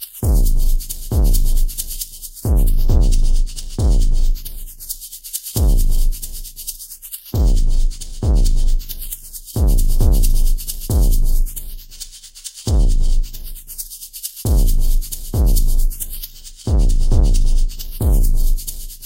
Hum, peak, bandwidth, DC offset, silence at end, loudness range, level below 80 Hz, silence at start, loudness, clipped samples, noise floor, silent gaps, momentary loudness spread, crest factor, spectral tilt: none; -2 dBFS; 16 kHz; under 0.1%; 0 s; 3 LU; -14 dBFS; 0 s; -21 LUFS; under 0.1%; -36 dBFS; none; 12 LU; 12 dB; -5.5 dB/octave